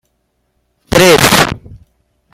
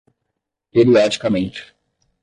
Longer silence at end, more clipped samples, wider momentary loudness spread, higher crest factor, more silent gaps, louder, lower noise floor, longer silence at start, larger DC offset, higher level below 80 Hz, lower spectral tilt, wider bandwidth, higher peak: about the same, 0.55 s vs 0.6 s; first, 0.2% vs under 0.1%; second, 11 LU vs 14 LU; about the same, 14 dB vs 16 dB; neither; first, -8 LUFS vs -16 LUFS; second, -63 dBFS vs -78 dBFS; first, 0.9 s vs 0.75 s; neither; first, -36 dBFS vs -52 dBFS; second, -3.5 dB/octave vs -6 dB/octave; first, over 20 kHz vs 10.5 kHz; first, 0 dBFS vs -4 dBFS